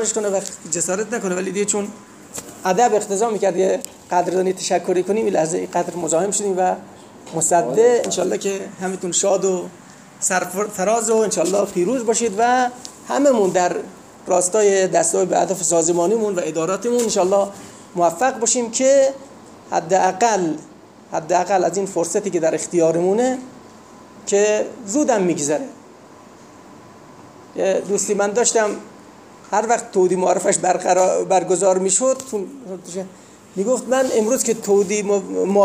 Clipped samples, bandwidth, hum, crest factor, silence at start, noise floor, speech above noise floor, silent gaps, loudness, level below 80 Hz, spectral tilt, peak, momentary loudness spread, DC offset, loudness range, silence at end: under 0.1%; 16 kHz; none; 16 dB; 0 s; -43 dBFS; 25 dB; none; -19 LUFS; -64 dBFS; -3.5 dB/octave; -4 dBFS; 11 LU; under 0.1%; 4 LU; 0 s